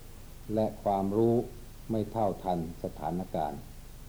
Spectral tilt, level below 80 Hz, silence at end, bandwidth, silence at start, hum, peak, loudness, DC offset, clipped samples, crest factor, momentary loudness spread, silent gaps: -8 dB/octave; -48 dBFS; 0 s; over 20 kHz; 0 s; none; -16 dBFS; -32 LUFS; under 0.1%; under 0.1%; 16 dB; 19 LU; none